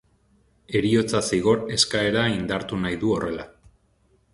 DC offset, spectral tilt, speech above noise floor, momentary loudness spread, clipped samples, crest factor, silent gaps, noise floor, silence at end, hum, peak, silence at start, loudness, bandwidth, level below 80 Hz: under 0.1%; -4.5 dB/octave; 41 dB; 7 LU; under 0.1%; 20 dB; none; -63 dBFS; 0.85 s; none; -4 dBFS; 0.7 s; -23 LUFS; 11.5 kHz; -50 dBFS